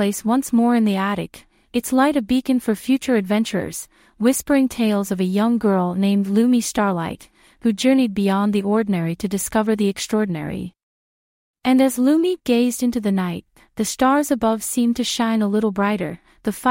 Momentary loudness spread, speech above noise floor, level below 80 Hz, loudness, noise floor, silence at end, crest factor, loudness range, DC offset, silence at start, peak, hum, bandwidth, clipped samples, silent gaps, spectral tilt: 10 LU; over 71 dB; -52 dBFS; -20 LUFS; under -90 dBFS; 0 s; 16 dB; 2 LU; under 0.1%; 0 s; -4 dBFS; none; 16.5 kHz; under 0.1%; 10.83-11.54 s; -5 dB/octave